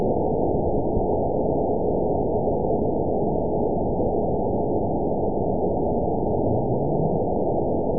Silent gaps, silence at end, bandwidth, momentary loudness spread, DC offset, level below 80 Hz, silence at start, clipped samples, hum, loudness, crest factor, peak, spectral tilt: none; 0 s; 1 kHz; 1 LU; 3%; -36 dBFS; 0 s; under 0.1%; none; -24 LUFS; 14 dB; -8 dBFS; -19 dB/octave